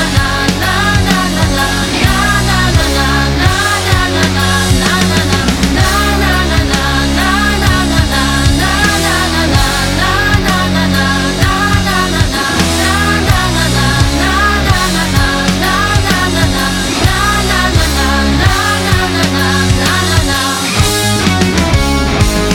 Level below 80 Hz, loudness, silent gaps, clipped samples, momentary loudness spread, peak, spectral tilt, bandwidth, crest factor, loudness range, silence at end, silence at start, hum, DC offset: -18 dBFS; -11 LUFS; none; under 0.1%; 2 LU; 0 dBFS; -4 dB/octave; 18.5 kHz; 10 dB; 0 LU; 0 s; 0 s; none; under 0.1%